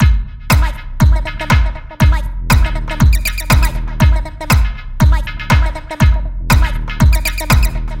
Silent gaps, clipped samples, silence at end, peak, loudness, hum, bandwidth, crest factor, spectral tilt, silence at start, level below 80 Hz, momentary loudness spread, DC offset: none; under 0.1%; 0 s; 0 dBFS; -15 LUFS; none; 17 kHz; 12 dB; -5 dB/octave; 0 s; -14 dBFS; 6 LU; 0.3%